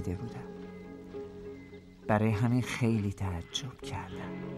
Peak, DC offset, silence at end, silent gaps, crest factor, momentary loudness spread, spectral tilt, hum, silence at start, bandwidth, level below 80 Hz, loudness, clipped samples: -12 dBFS; under 0.1%; 0 s; none; 22 dB; 17 LU; -6 dB/octave; none; 0 s; 13.5 kHz; -56 dBFS; -33 LUFS; under 0.1%